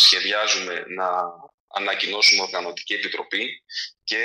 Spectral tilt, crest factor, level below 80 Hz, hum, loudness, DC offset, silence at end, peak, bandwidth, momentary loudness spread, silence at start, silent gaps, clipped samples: 0.5 dB/octave; 20 dB; -72 dBFS; none; -21 LUFS; under 0.1%; 0 s; -4 dBFS; 14.5 kHz; 14 LU; 0 s; 1.54-1.68 s; under 0.1%